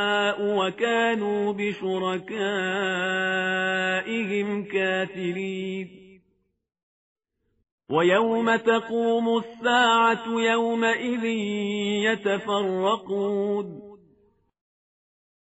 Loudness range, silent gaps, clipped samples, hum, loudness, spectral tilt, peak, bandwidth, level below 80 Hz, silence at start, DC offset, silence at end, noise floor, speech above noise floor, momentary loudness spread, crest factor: 7 LU; 6.83-7.16 s, 7.72-7.78 s; under 0.1%; none; -24 LUFS; -2.5 dB/octave; -8 dBFS; 8 kHz; -70 dBFS; 0 s; under 0.1%; 1.45 s; -71 dBFS; 47 dB; 8 LU; 18 dB